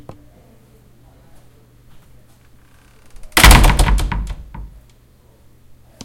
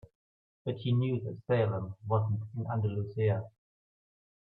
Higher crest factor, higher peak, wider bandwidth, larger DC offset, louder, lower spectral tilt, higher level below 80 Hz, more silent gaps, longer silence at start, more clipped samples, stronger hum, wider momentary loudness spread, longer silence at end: about the same, 18 dB vs 18 dB; first, 0 dBFS vs -16 dBFS; first, 17 kHz vs 4.2 kHz; neither; first, -12 LUFS vs -33 LUFS; second, -3.5 dB/octave vs -11 dB/octave; first, -20 dBFS vs -68 dBFS; neither; first, 3.15 s vs 0.65 s; first, 0.2% vs under 0.1%; neither; first, 27 LU vs 8 LU; first, 1.4 s vs 0.95 s